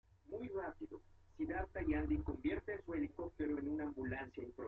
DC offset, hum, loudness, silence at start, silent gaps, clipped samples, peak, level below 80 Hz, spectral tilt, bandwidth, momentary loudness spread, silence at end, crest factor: under 0.1%; none; -43 LUFS; 0.3 s; none; under 0.1%; -26 dBFS; -54 dBFS; -9.5 dB/octave; 4.2 kHz; 10 LU; 0 s; 16 dB